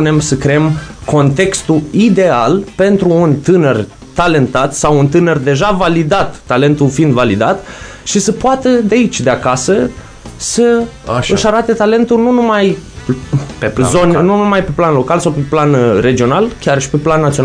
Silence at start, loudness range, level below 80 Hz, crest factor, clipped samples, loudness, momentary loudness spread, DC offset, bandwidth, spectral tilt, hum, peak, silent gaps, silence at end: 0 s; 2 LU; -34 dBFS; 10 dB; under 0.1%; -11 LUFS; 7 LU; under 0.1%; 11 kHz; -5.5 dB/octave; none; 0 dBFS; none; 0 s